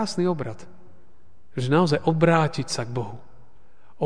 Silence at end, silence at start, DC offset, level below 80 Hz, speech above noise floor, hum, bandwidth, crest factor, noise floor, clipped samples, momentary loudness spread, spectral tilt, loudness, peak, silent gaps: 0 s; 0 s; 1%; -56 dBFS; 36 dB; none; 10 kHz; 20 dB; -59 dBFS; under 0.1%; 17 LU; -6 dB/octave; -23 LUFS; -6 dBFS; none